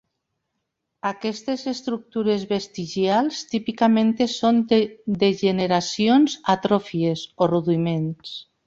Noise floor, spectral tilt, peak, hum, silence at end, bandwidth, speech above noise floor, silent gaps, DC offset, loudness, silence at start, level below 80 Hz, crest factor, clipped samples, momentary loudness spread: -78 dBFS; -6 dB/octave; -4 dBFS; none; 0.25 s; 7.8 kHz; 57 dB; none; under 0.1%; -22 LUFS; 1.05 s; -62 dBFS; 18 dB; under 0.1%; 10 LU